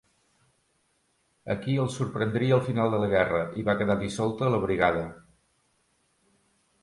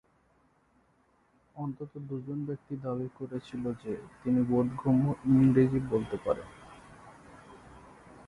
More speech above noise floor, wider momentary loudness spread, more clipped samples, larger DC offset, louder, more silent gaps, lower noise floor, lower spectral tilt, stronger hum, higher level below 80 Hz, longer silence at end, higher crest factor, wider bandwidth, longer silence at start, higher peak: first, 45 dB vs 39 dB; second, 8 LU vs 16 LU; neither; neither; first, -26 LUFS vs -30 LUFS; neither; about the same, -71 dBFS vs -68 dBFS; second, -7 dB/octave vs -9.5 dB/octave; neither; about the same, -54 dBFS vs -58 dBFS; first, 1.65 s vs 0.05 s; about the same, 20 dB vs 20 dB; about the same, 11.5 kHz vs 11 kHz; about the same, 1.45 s vs 1.55 s; first, -8 dBFS vs -12 dBFS